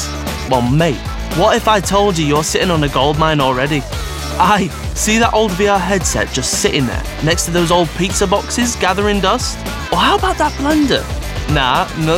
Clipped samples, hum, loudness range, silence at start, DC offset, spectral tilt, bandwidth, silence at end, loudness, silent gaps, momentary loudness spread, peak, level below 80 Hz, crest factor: under 0.1%; none; 1 LU; 0 s; under 0.1%; -4 dB/octave; 17 kHz; 0 s; -15 LUFS; none; 7 LU; 0 dBFS; -26 dBFS; 14 dB